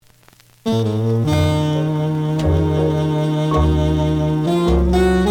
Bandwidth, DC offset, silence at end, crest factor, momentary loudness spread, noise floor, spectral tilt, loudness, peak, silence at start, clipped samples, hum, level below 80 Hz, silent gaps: 14 kHz; under 0.1%; 0 s; 12 dB; 4 LU; -50 dBFS; -7.5 dB/octave; -18 LUFS; -4 dBFS; 0.65 s; under 0.1%; none; -28 dBFS; none